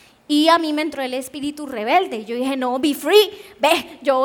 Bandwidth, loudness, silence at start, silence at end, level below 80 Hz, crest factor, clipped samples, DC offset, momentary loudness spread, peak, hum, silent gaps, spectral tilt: over 20 kHz; -19 LUFS; 0.3 s; 0 s; -64 dBFS; 18 dB; under 0.1%; under 0.1%; 11 LU; -2 dBFS; none; none; -2.5 dB/octave